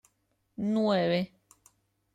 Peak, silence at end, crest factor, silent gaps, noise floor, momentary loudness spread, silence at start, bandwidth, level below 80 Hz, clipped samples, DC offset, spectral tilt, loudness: -16 dBFS; 0.9 s; 16 dB; none; -75 dBFS; 14 LU; 0.6 s; 10.5 kHz; -72 dBFS; under 0.1%; under 0.1%; -7 dB/octave; -29 LUFS